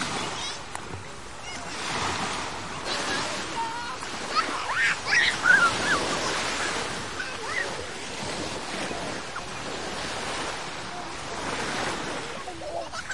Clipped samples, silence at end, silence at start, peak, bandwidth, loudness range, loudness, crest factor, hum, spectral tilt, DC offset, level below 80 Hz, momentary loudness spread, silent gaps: under 0.1%; 0 s; 0 s; -8 dBFS; 11.5 kHz; 8 LU; -28 LUFS; 22 dB; none; -2 dB/octave; 0.7%; -54 dBFS; 13 LU; none